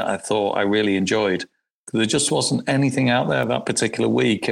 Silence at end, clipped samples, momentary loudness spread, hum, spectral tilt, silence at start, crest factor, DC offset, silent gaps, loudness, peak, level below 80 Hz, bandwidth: 0 s; under 0.1%; 5 LU; none; -4.5 dB/octave; 0 s; 14 dB; under 0.1%; 1.71-1.87 s; -20 LUFS; -6 dBFS; -58 dBFS; 15.5 kHz